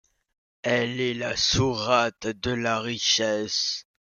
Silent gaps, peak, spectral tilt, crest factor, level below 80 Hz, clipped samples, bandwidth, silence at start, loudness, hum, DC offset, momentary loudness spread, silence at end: none; -8 dBFS; -3 dB/octave; 18 dB; -52 dBFS; under 0.1%; 11 kHz; 0.65 s; -24 LUFS; none; under 0.1%; 7 LU; 0.35 s